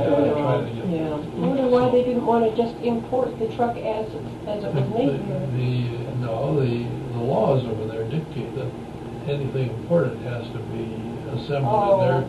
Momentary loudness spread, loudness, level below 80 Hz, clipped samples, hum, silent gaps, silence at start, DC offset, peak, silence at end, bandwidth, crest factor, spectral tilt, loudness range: 11 LU; -24 LUFS; -48 dBFS; under 0.1%; none; none; 0 s; under 0.1%; -8 dBFS; 0 s; 12 kHz; 16 dB; -8.5 dB/octave; 5 LU